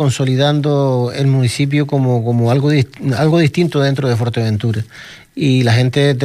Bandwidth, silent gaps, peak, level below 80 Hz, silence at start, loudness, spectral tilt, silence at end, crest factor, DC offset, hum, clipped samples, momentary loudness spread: 13 kHz; none; -2 dBFS; -50 dBFS; 0 s; -15 LUFS; -6.5 dB/octave; 0 s; 12 dB; under 0.1%; none; under 0.1%; 6 LU